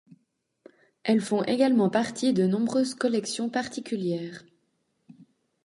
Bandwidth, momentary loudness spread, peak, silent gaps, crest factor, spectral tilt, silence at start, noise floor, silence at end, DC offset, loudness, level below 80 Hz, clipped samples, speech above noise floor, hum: 11.5 kHz; 10 LU; -10 dBFS; none; 18 dB; -5.5 dB/octave; 1.05 s; -74 dBFS; 0.4 s; under 0.1%; -26 LUFS; -72 dBFS; under 0.1%; 48 dB; none